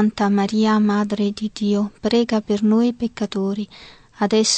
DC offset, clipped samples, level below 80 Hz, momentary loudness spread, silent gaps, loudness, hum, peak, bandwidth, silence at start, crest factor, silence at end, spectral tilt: under 0.1%; under 0.1%; -54 dBFS; 8 LU; none; -20 LUFS; none; -6 dBFS; 9 kHz; 0 s; 14 dB; 0 s; -5 dB/octave